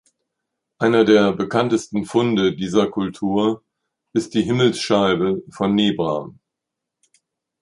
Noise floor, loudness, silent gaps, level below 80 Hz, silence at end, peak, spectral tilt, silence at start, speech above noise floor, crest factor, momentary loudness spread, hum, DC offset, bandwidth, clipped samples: -83 dBFS; -19 LUFS; none; -56 dBFS; 1.3 s; -2 dBFS; -6 dB/octave; 0.8 s; 64 dB; 18 dB; 8 LU; none; under 0.1%; 11.5 kHz; under 0.1%